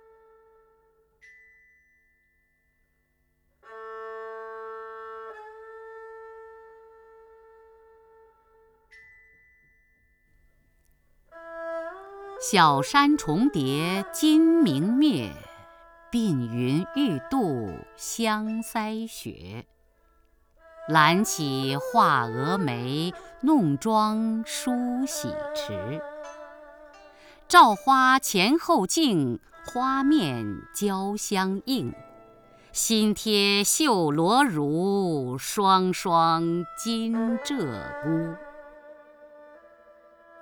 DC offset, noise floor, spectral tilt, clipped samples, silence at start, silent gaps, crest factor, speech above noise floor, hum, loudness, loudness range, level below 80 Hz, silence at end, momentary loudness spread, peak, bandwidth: under 0.1%; -70 dBFS; -4 dB/octave; under 0.1%; 3.7 s; none; 24 dB; 47 dB; none; -24 LUFS; 19 LU; -60 dBFS; 0.95 s; 21 LU; -2 dBFS; over 20 kHz